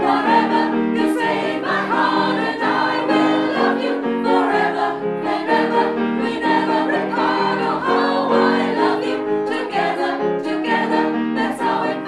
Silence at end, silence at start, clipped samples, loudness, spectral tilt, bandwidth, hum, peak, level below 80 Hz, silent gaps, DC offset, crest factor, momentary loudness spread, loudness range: 0 s; 0 s; under 0.1%; -18 LUFS; -5.5 dB/octave; 12 kHz; none; -4 dBFS; -62 dBFS; none; under 0.1%; 14 dB; 5 LU; 1 LU